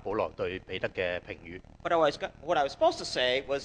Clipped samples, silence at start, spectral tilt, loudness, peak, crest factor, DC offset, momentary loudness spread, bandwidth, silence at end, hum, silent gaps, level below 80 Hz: under 0.1%; 0.05 s; -4 dB/octave; -30 LUFS; -12 dBFS; 18 dB; under 0.1%; 12 LU; 10 kHz; 0 s; none; none; -56 dBFS